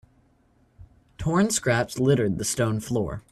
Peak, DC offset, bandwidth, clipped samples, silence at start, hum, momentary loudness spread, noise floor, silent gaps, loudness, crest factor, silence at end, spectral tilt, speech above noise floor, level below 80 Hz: -8 dBFS; under 0.1%; 14 kHz; under 0.1%; 0.8 s; none; 6 LU; -62 dBFS; none; -24 LUFS; 18 dB; 0.1 s; -5 dB/octave; 39 dB; -50 dBFS